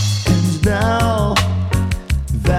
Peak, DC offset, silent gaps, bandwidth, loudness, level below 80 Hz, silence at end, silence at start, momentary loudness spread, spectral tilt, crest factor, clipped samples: -2 dBFS; under 0.1%; none; 15.5 kHz; -17 LUFS; -24 dBFS; 0 s; 0 s; 5 LU; -5.5 dB/octave; 14 dB; under 0.1%